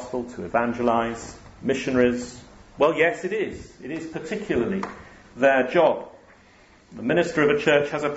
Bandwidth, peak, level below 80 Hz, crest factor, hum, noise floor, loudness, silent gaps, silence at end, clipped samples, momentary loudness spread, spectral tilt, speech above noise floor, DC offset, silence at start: 8 kHz; -4 dBFS; -54 dBFS; 20 dB; none; -53 dBFS; -23 LUFS; none; 0 s; under 0.1%; 15 LU; -5.5 dB/octave; 30 dB; under 0.1%; 0 s